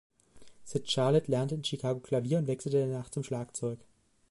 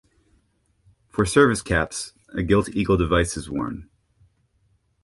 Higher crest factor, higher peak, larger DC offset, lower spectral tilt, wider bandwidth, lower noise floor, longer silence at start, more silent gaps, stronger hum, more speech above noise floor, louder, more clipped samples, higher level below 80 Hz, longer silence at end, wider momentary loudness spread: about the same, 18 dB vs 22 dB; second, -14 dBFS vs -2 dBFS; neither; about the same, -6 dB/octave vs -5.5 dB/octave; about the same, 11.5 kHz vs 11.5 kHz; second, -54 dBFS vs -66 dBFS; second, 0.35 s vs 1.15 s; neither; neither; second, 23 dB vs 44 dB; second, -32 LUFS vs -22 LUFS; neither; second, -68 dBFS vs -38 dBFS; second, 0.45 s vs 1.2 s; second, 10 LU vs 14 LU